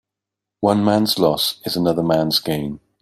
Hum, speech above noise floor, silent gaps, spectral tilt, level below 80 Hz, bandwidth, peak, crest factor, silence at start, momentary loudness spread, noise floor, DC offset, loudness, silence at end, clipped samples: none; 66 dB; none; -5 dB/octave; -52 dBFS; 16 kHz; -2 dBFS; 18 dB; 0.6 s; 7 LU; -84 dBFS; under 0.1%; -18 LUFS; 0.25 s; under 0.1%